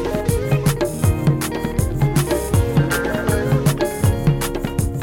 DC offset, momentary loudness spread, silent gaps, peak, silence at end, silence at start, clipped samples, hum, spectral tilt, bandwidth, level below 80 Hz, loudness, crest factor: under 0.1%; 4 LU; none; -6 dBFS; 0 s; 0 s; under 0.1%; none; -6 dB/octave; 17 kHz; -30 dBFS; -19 LUFS; 12 dB